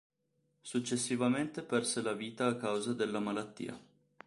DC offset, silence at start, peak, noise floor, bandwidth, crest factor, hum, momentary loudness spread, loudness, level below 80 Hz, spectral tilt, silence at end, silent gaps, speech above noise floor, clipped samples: under 0.1%; 0.65 s; -18 dBFS; -79 dBFS; 11.5 kHz; 18 dB; none; 12 LU; -35 LUFS; -76 dBFS; -4 dB/octave; 0.45 s; none; 44 dB; under 0.1%